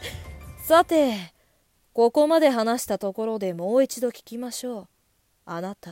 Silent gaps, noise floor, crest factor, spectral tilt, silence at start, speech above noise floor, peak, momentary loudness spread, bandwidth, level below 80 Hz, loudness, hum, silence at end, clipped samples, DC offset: none; -67 dBFS; 20 dB; -4.5 dB/octave; 0 s; 45 dB; -4 dBFS; 18 LU; 16.5 kHz; -52 dBFS; -23 LUFS; none; 0 s; under 0.1%; under 0.1%